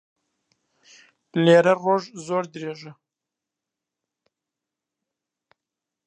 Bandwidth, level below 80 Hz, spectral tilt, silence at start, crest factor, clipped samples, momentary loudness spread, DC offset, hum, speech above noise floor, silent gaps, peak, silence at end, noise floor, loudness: 9.2 kHz; -80 dBFS; -6 dB/octave; 1.35 s; 22 dB; under 0.1%; 18 LU; under 0.1%; none; 66 dB; none; -4 dBFS; 3.15 s; -87 dBFS; -21 LUFS